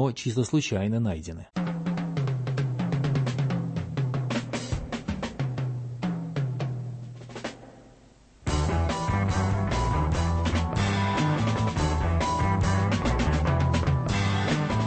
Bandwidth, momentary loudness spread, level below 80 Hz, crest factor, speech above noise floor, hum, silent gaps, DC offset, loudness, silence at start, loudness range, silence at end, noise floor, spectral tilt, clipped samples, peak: 8.8 kHz; 8 LU; -36 dBFS; 14 dB; 28 dB; none; none; under 0.1%; -27 LUFS; 0 s; 7 LU; 0 s; -55 dBFS; -6 dB/octave; under 0.1%; -12 dBFS